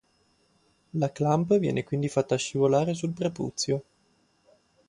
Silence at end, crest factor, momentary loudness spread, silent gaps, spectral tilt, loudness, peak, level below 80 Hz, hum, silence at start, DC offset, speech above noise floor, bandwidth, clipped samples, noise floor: 1.1 s; 18 dB; 7 LU; none; -6 dB/octave; -27 LUFS; -10 dBFS; -64 dBFS; none; 0.95 s; under 0.1%; 41 dB; 11.5 kHz; under 0.1%; -67 dBFS